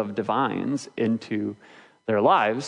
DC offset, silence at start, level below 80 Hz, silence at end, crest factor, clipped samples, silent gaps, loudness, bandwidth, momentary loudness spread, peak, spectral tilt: under 0.1%; 0 s; -74 dBFS; 0 s; 18 dB; under 0.1%; none; -25 LUFS; 10.5 kHz; 13 LU; -6 dBFS; -6 dB/octave